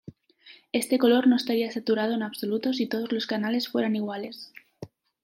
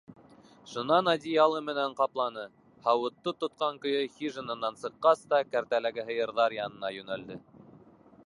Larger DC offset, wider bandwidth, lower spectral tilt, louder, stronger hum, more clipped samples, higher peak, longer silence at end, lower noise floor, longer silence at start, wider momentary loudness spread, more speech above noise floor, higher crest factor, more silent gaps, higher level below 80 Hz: neither; first, 16.5 kHz vs 11.5 kHz; about the same, -4.5 dB/octave vs -5 dB/octave; first, -26 LUFS vs -30 LUFS; neither; neither; about the same, -8 dBFS vs -10 dBFS; second, 0.4 s vs 0.85 s; about the same, -54 dBFS vs -56 dBFS; first, 0.45 s vs 0.1 s; first, 23 LU vs 13 LU; about the same, 29 dB vs 27 dB; about the same, 18 dB vs 20 dB; neither; about the same, -76 dBFS vs -76 dBFS